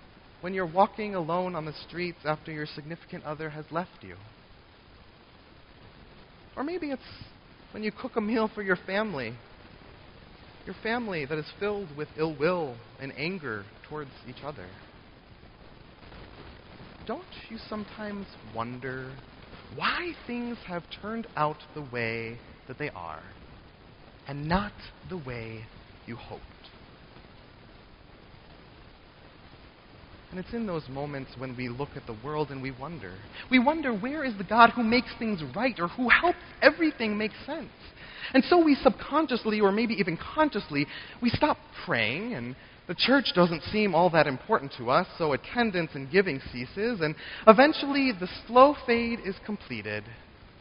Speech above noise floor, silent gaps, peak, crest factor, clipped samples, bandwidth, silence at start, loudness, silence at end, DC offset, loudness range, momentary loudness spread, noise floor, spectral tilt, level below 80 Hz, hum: 26 dB; none; 0 dBFS; 30 dB; under 0.1%; 5.4 kHz; 0.4 s; -28 LUFS; 0.15 s; under 0.1%; 17 LU; 22 LU; -54 dBFS; -3.5 dB/octave; -54 dBFS; none